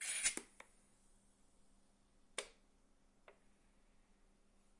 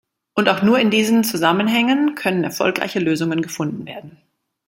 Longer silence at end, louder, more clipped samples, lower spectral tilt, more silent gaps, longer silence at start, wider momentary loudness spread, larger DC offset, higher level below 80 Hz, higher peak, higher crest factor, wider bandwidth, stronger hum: first, 1.45 s vs 0.55 s; second, -42 LUFS vs -18 LUFS; neither; second, 1 dB/octave vs -4.5 dB/octave; neither; second, 0 s vs 0.35 s; first, 25 LU vs 10 LU; neither; second, -74 dBFS vs -62 dBFS; second, -22 dBFS vs -2 dBFS; first, 28 dB vs 18 dB; second, 12 kHz vs 16.5 kHz; neither